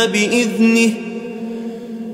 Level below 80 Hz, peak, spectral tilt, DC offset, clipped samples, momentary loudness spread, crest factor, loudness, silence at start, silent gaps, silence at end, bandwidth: -64 dBFS; -2 dBFS; -4 dB/octave; under 0.1%; under 0.1%; 15 LU; 14 dB; -16 LUFS; 0 s; none; 0 s; 15 kHz